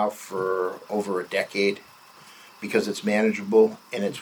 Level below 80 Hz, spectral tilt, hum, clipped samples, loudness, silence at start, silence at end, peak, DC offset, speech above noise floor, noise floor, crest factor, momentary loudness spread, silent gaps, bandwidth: -78 dBFS; -5 dB/octave; none; under 0.1%; -25 LUFS; 0 s; 0 s; -8 dBFS; under 0.1%; 25 dB; -49 dBFS; 18 dB; 10 LU; none; over 20 kHz